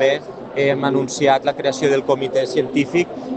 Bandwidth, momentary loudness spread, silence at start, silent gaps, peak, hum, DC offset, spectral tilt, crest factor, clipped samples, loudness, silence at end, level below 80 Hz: 8.8 kHz; 4 LU; 0 s; none; -2 dBFS; none; under 0.1%; -5 dB/octave; 16 dB; under 0.1%; -19 LUFS; 0 s; -60 dBFS